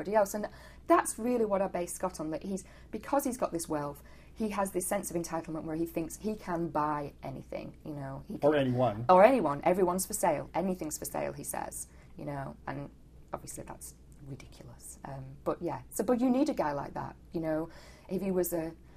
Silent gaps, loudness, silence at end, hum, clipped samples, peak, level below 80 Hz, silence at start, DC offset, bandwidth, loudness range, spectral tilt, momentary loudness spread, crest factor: none; -32 LUFS; 0 s; none; under 0.1%; -8 dBFS; -56 dBFS; 0 s; under 0.1%; 15 kHz; 14 LU; -5.5 dB/octave; 17 LU; 24 dB